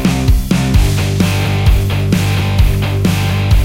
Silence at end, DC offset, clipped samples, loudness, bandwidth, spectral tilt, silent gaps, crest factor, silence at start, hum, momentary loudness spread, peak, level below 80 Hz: 0 s; under 0.1%; under 0.1%; -14 LUFS; 16.5 kHz; -6 dB/octave; none; 12 dB; 0 s; none; 1 LU; 0 dBFS; -16 dBFS